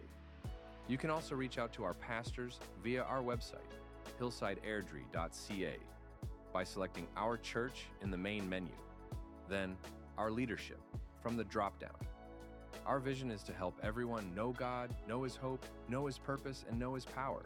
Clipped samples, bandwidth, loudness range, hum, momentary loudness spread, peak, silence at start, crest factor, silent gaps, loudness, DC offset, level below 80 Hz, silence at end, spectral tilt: under 0.1%; 18 kHz; 2 LU; none; 12 LU; -24 dBFS; 0 s; 20 dB; none; -43 LUFS; under 0.1%; -56 dBFS; 0 s; -6 dB/octave